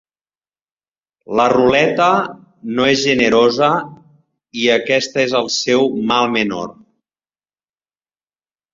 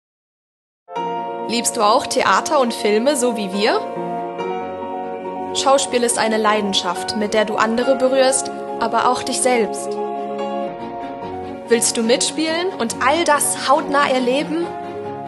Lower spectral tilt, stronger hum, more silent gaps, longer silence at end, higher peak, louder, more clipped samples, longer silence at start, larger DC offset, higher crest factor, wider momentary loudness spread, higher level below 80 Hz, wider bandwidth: first, -4 dB/octave vs -2.5 dB/octave; neither; neither; first, 2 s vs 0 s; about the same, -2 dBFS vs 0 dBFS; first, -15 LUFS vs -18 LUFS; neither; first, 1.3 s vs 0.9 s; neither; about the same, 16 dB vs 18 dB; about the same, 13 LU vs 11 LU; first, -54 dBFS vs -62 dBFS; second, 7.6 kHz vs 13 kHz